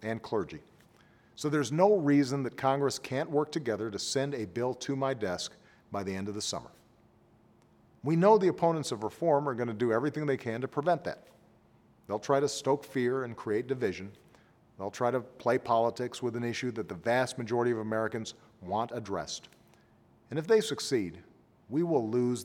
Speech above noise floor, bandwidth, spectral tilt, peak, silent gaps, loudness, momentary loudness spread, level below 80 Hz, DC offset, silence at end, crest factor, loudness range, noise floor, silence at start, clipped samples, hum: 33 dB; 16.5 kHz; -5.5 dB/octave; -10 dBFS; none; -31 LUFS; 12 LU; -70 dBFS; under 0.1%; 0 s; 20 dB; 5 LU; -63 dBFS; 0 s; under 0.1%; none